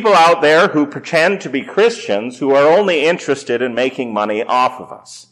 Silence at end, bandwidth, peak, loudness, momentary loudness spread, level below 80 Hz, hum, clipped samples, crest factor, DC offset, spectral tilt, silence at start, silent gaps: 0.1 s; 13 kHz; -4 dBFS; -14 LUFS; 10 LU; -68 dBFS; none; under 0.1%; 10 dB; under 0.1%; -4.5 dB/octave; 0 s; none